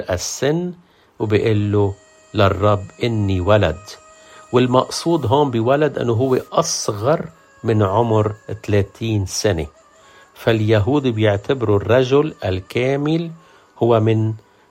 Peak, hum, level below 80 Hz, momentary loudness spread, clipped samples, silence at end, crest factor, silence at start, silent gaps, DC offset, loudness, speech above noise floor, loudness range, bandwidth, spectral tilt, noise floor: 0 dBFS; none; -48 dBFS; 9 LU; under 0.1%; 0.3 s; 18 dB; 0 s; none; under 0.1%; -18 LUFS; 31 dB; 2 LU; 14.5 kHz; -6 dB/octave; -48 dBFS